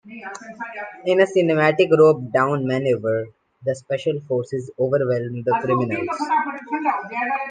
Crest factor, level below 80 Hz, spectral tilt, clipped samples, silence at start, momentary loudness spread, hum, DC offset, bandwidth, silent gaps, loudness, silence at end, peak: 18 dB; -66 dBFS; -7 dB/octave; under 0.1%; 0.05 s; 15 LU; none; under 0.1%; 9.4 kHz; none; -20 LUFS; 0 s; -4 dBFS